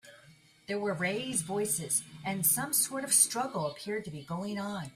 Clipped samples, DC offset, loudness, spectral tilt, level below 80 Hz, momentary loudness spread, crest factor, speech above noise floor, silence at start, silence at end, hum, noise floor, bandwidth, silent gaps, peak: under 0.1%; under 0.1%; -30 LUFS; -2.5 dB/octave; -70 dBFS; 13 LU; 22 dB; 27 dB; 0.05 s; 0.05 s; none; -59 dBFS; 16 kHz; none; -10 dBFS